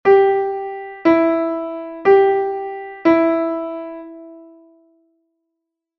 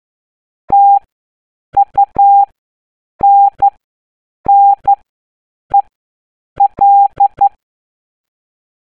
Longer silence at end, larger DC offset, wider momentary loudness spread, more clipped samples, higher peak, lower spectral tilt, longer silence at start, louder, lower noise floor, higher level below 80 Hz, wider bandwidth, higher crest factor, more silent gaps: first, 1.55 s vs 1.4 s; second, under 0.1% vs 0.4%; first, 17 LU vs 6 LU; neither; about the same, -2 dBFS vs -2 dBFS; about the same, -7.5 dB/octave vs -8.5 dB/octave; second, 0.05 s vs 0.7 s; second, -17 LUFS vs -11 LUFS; second, -79 dBFS vs under -90 dBFS; second, -60 dBFS vs -48 dBFS; first, 5.8 kHz vs 2.5 kHz; first, 16 dB vs 10 dB; second, none vs 1.12-1.72 s, 2.58-3.19 s, 3.84-4.44 s, 5.09-5.70 s, 5.95-6.56 s